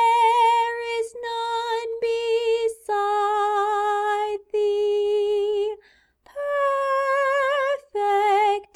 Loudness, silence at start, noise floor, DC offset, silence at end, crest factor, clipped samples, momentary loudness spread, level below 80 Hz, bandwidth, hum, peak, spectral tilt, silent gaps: -22 LUFS; 0 s; -56 dBFS; under 0.1%; 0.1 s; 14 dB; under 0.1%; 8 LU; -64 dBFS; 12 kHz; none; -8 dBFS; -1.5 dB/octave; none